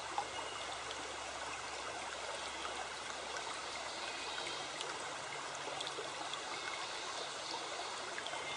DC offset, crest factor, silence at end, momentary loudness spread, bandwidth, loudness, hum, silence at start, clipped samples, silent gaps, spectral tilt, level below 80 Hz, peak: under 0.1%; 20 dB; 0 s; 2 LU; 10 kHz; -42 LUFS; none; 0 s; under 0.1%; none; -0.5 dB/octave; -70 dBFS; -24 dBFS